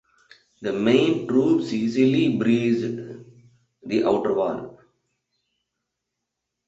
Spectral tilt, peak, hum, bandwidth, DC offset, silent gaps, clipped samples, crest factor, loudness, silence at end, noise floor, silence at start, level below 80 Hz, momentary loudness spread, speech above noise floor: -7 dB/octave; -6 dBFS; none; 8 kHz; under 0.1%; none; under 0.1%; 18 dB; -22 LUFS; 2 s; -82 dBFS; 0.6 s; -64 dBFS; 15 LU; 61 dB